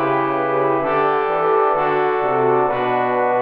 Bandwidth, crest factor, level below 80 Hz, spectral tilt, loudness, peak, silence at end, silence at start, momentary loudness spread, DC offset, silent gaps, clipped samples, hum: 5.2 kHz; 12 dB; -52 dBFS; -9 dB/octave; -18 LUFS; -4 dBFS; 0 s; 0 s; 2 LU; under 0.1%; none; under 0.1%; none